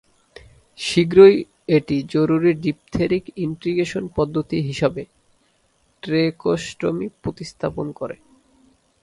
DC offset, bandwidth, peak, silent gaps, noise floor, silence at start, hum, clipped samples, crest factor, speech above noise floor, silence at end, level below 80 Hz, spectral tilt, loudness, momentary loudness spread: under 0.1%; 11.5 kHz; 0 dBFS; none; -63 dBFS; 0.8 s; none; under 0.1%; 20 dB; 44 dB; 0.9 s; -50 dBFS; -6.5 dB/octave; -20 LUFS; 16 LU